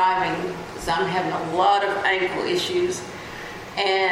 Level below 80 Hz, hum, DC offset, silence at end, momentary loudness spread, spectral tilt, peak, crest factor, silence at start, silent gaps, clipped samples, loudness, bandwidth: -52 dBFS; none; under 0.1%; 0 s; 13 LU; -4 dB/octave; -6 dBFS; 16 dB; 0 s; none; under 0.1%; -23 LUFS; 16 kHz